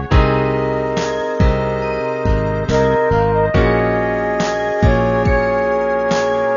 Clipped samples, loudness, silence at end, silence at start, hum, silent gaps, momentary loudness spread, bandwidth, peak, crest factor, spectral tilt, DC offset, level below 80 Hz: under 0.1%; -16 LUFS; 0 s; 0 s; none; none; 5 LU; 7.4 kHz; 0 dBFS; 14 dB; -7 dB/octave; under 0.1%; -24 dBFS